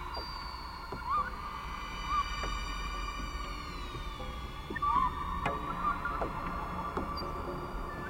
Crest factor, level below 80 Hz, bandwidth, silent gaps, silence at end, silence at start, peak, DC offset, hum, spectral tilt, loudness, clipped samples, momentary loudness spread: 18 dB; -42 dBFS; 16 kHz; none; 0 s; 0 s; -18 dBFS; under 0.1%; none; -5 dB/octave; -36 LUFS; under 0.1%; 9 LU